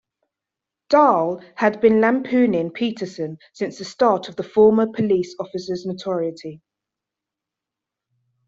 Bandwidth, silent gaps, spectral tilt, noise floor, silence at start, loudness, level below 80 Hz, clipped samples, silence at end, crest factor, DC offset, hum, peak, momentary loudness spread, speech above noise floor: 7.8 kHz; none; -6.5 dB/octave; -86 dBFS; 0.9 s; -20 LUFS; -62 dBFS; under 0.1%; 1.9 s; 18 dB; under 0.1%; none; -2 dBFS; 14 LU; 66 dB